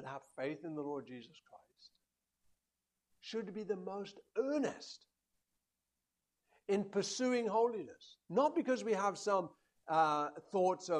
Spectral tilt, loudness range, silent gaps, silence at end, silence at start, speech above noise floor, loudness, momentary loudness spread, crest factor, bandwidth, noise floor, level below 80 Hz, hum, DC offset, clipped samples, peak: -4.5 dB/octave; 12 LU; none; 0 s; 0 s; 52 dB; -37 LUFS; 18 LU; 20 dB; 11 kHz; -90 dBFS; -86 dBFS; none; under 0.1%; under 0.1%; -20 dBFS